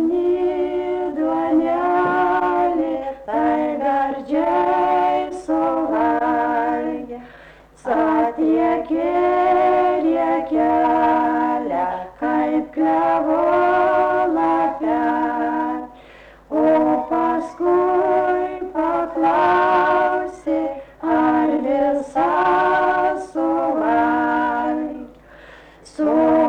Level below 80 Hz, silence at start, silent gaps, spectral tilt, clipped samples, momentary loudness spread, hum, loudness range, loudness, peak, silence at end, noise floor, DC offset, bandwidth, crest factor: -52 dBFS; 0 s; none; -6.5 dB/octave; under 0.1%; 7 LU; none; 2 LU; -19 LUFS; -8 dBFS; 0 s; -45 dBFS; under 0.1%; 8.8 kHz; 10 dB